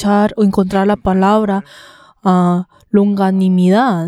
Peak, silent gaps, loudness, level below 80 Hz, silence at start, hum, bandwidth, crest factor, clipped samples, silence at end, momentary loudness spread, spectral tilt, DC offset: 0 dBFS; none; -14 LUFS; -42 dBFS; 0 s; none; 11.5 kHz; 12 dB; under 0.1%; 0 s; 6 LU; -8 dB/octave; under 0.1%